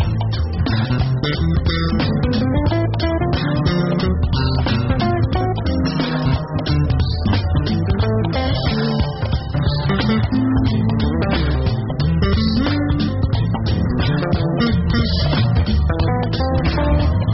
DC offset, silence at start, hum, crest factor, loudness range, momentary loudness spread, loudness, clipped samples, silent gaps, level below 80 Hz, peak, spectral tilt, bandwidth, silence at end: under 0.1%; 0 s; none; 12 dB; 1 LU; 3 LU; -18 LUFS; under 0.1%; none; -24 dBFS; -6 dBFS; -6 dB/octave; 6 kHz; 0 s